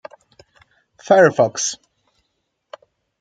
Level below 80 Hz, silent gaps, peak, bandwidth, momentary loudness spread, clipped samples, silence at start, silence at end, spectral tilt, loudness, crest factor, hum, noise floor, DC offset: -66 dBFS; none; -2 dBFS; 9.4 kHz; 12 LU; under 0.1%; 1.1 s; 1.45 s; -3.5 dB/octave; -16 LUFS; 20 dB; none; -73 dBFS; under 0.1%